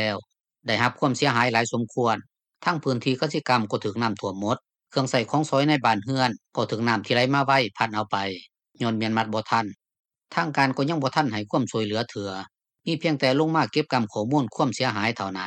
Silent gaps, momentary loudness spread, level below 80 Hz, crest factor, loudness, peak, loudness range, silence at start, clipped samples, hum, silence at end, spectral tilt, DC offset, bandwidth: 10.00-10.04 s; 9 LU; -68 dBFS; 20 dB; -24 LUFS; -4 dBFS; 3 LU; 0 s; under 0.1%; none; 0 s; -5 dB/octave; under 0.1%; 11.5 kHz